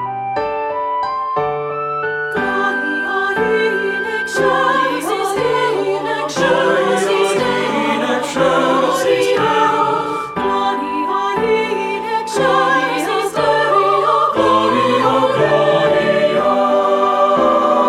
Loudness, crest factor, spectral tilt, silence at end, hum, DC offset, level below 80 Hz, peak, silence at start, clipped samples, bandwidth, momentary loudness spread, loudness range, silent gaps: -15 LUFS; 14 dB; -4.5 dB/octave; 0 s; none; under 0.1%; -52 dBFS; -2 dBFS; 0 s; under 0.1%; 15 kHz; 6 LU; 4 LU; none